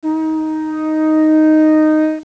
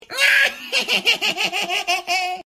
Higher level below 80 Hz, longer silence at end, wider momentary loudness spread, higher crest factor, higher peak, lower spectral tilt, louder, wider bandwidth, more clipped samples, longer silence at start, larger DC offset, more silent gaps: first, -58 dBFS vs -66 dBFS; about the same, 0.05 s vs 0.15 s; about the same, 9 LU vs 7 LU; second, 8 dB vs 16 dB; about the same, -4 dBFS vs -4 dBFS; first, -6.5 dB/octave vs 0 dB/octave; first, -13 LUFS vs -18 LUFS; second, 5.6 kHz vs 16 kHz; neither; about the same, 0.05 s vs 0.1 s; neither; neither